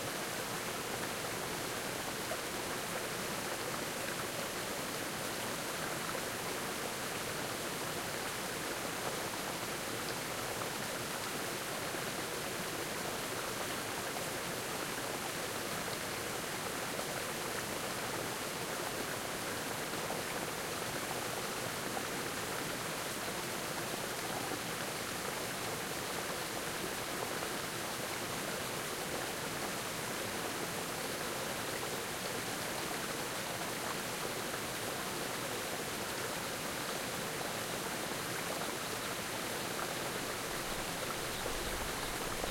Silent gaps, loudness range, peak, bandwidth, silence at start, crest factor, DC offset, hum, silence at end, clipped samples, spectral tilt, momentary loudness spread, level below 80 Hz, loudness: none; 0 LU; -22 dBFS; 16.5 kHz; 0 s; 18 dB; under 0.1%; none; 0 s; under 0.1%; -2.5 dB/octave; 1 LU; -60 dBFS; -38 LUFS